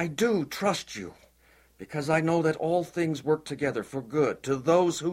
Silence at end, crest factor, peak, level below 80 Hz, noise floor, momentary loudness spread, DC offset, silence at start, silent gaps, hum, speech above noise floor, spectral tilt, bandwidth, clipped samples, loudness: 0 s; 18 dB; -10 dBFS; -64 dBFS; -61 dBFS; 10 LU; under 0.1%; 0 s; none; none; 34 dB; -5.5 dB/octave; 16 kHz; under 0.1%; -27 LUFS